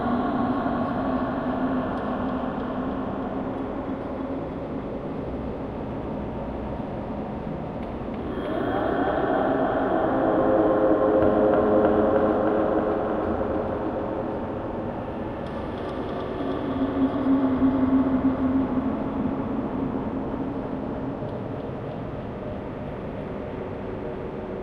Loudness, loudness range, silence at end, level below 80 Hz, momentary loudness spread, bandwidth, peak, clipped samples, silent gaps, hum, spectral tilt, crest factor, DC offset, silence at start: -26 LUFS; 10 LU; 0 s; -44 dBFS; 12 LU; 5.4 kHz; -8 dBFS; under 0.1%; none; none; -9.5 dB/octave; 18 dB; under 0.1%; 0 s